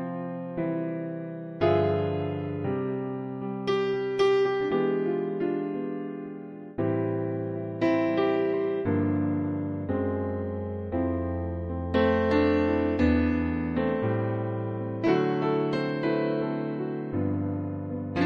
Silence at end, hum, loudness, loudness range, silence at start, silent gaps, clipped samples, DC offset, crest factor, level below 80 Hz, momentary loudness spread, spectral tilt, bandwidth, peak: 0 s; none; -28 LUFS; 4 LU; 0 s; none; under 0.1%; under 0.1%; 16 dB; -48 dBFS; 10 LU; -8.5 dB/octave; 7 kHz; -12 dBFS